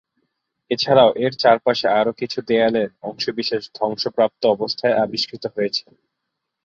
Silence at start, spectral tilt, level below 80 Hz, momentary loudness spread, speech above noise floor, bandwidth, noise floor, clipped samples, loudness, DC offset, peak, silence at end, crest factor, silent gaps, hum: 0.7 s; -5 dB/octave; -62 dBFS; 10 LU; 60 dB; 7.4 kHz; -79 dBFS; under 0.1%; -19 LUFS; under 0.1%; -2 dBFS; 0.85 s; 18 dB; none; none